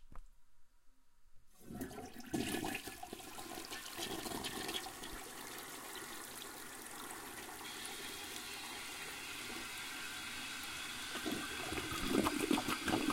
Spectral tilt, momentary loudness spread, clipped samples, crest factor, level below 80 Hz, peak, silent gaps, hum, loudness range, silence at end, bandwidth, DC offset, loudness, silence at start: -2.5 dB/octave; 12 LU; under 0.1%; 24 dB; -60 dBFS; -20 dBFS; none; none; 7 LU; 0 s; 17 kHz; under 0.1%; -42 LUFS; 0 s